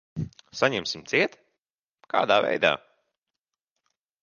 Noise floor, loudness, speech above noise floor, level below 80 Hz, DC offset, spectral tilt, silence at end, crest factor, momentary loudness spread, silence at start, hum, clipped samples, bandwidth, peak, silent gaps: -86 dBFS; -25 LUFS; 62 dB; -62 dBFS; under 0.1%; -4 dB/octave; 1.45 s; 24 dB; 14 LU; 0.15 s; none; under 0.1%; 7.2 kHz; -4 dBFS; 1.70-1.95 s